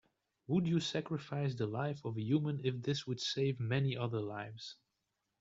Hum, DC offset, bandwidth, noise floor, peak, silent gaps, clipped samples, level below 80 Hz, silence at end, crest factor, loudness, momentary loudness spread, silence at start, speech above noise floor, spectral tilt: none; under 0.1%; 7.8 kHz; -86 dBFS; -20 dBFS; none; under 0.1%; -72 dBFS; 0.7 s; 16 dB; -37 LUFS; 8 LU; 0.5 s; 49 dB; -6.5 dB/octave